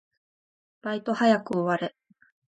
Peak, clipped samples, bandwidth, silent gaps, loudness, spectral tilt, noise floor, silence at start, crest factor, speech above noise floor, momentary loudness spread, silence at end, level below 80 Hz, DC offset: -8 dBFS; under 0.1%; 9 kHz; none; -26 LUFS; -6.5 dB/octave; under -90 dBFS; 0.85 s; 20 dB; over 65 dB; 13 LU; 0.65 s; -74 dBFS; under 0.1%